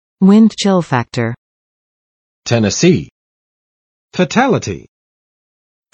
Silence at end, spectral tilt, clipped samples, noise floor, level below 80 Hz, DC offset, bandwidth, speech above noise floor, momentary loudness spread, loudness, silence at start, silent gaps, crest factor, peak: 1.15 s; -5.5 dB/octave; under 0.1%; under -90 dBFS; -50 dBFS; under 0.1%; 8.8 kHz; over 78 dB; 18 LU; -13 LUFS; 0.2 s; 1.38-2.43 s, 3.11-4.08 s; 16 dB; 0 dBFS